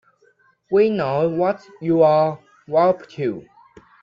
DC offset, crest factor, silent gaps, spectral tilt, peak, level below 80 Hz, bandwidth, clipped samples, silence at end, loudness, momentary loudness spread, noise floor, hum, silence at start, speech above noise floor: under 0.1%; 16 dB; none; -9 dB/octave; -4 dBFS; -62 dBFS; 7 kHz; under 0.1%; 0.6 s; -19 LUFS; 11 LU; -59 dBFS; none; 0.7 s; 41 dB